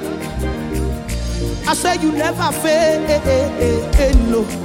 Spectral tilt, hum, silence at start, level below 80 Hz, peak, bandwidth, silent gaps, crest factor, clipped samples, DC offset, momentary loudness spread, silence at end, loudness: -5 dB/octave; none; 0 s; -22 dBFS; -2 dBFS; 16.5 kHz; none; 14 dB; under 0.1%; under 0.1%; 8 LU; 0 s; -17 LUFS